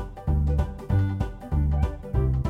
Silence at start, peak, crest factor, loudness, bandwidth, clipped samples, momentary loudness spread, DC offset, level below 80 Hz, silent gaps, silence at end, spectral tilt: 0 s; -12 dBFS; 14 dB; -27 LUFS; 4.7 kHz; under 0.1%; 4 LU; under 0.1%; -28 dBFS; none; 0 s; -9.5 dB/octave